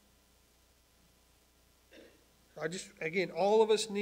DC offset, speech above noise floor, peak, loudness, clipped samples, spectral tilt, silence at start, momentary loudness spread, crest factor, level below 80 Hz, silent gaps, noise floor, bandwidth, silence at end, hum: under 0.1%; 36 dB; -16 dBFS; -32 LUFS; under 0.1%; -4 dB/octave; 1.95 s; 13 LU; 20 dB; -72 dBFS; none; -67 dBFS; 16 kHz; 0 s; none